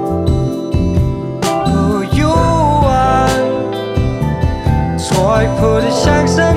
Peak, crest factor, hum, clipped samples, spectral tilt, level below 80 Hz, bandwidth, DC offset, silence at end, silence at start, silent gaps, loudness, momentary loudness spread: 0 dBFS; 12 dB; none; under 0.1%; -6.5 dB/octave; -24 dBFS; 15.5 kHz; under 0.1%; 0 s; 0 s; none; -14 LUFS; 5 LU